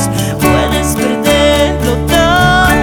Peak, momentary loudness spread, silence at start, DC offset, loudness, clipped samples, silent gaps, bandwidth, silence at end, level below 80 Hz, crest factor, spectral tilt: 0 dBFS; 5 LU; 0 s; under 0.1%; -10 LUFS; under 0.1%; none; over 20 kHz; 0 s; -22 dBFS; 10 dB; -4.5 dB/octave